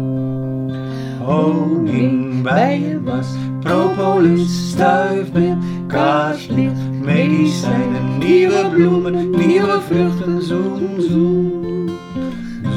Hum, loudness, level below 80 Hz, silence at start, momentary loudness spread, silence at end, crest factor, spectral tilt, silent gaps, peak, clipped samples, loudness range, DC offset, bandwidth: none; -16 LUFS; -48 dBFS; 0 s; 9 LU; 0 s; 14 dB; -7.5 dB/octave; none; 0 dBFS; under 0.1%; 3 LU; under 0.1%; 11.5 kHz